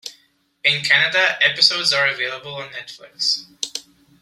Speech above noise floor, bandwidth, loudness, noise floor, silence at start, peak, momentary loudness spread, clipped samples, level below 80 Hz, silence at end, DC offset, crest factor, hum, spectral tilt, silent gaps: 40 dB; 15.5 kHz; -17 LUFS; -59 dBFS; 0.05 s; 0 dBFS; 19 LU; under 0.1%; -68 dBFS; 0.4 s; under 0.1%; 20 dB; none; -0.5 dB/octave; none